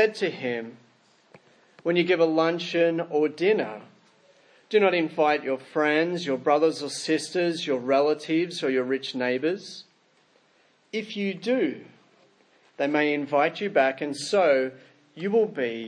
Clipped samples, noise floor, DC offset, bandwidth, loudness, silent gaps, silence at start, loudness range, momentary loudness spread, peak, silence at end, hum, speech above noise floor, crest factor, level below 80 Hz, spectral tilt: under 0.1%; -63 dBFS; under 0.1%; 10.5 kHz; -25 LUFS; none; 0 s; 5 LU; 11 LU; -8 dBFS; 0 s; none; 39 dB; 18 dB; -84 dBFS; -5 dB/octave